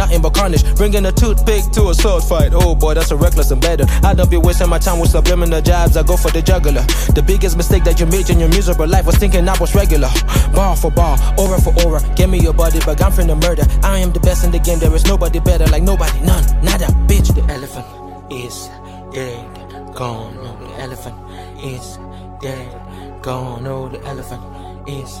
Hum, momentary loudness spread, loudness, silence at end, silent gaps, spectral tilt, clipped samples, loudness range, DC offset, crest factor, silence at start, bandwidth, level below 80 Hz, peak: none; 17 LU; -14 LUFS; 0 s; none; -5.5 dB/octave; under 0.1%; 14 LU; under 0.1%; 12 dB; 0 s; 15.5 kHz; -14 dBFS; 0 dBFS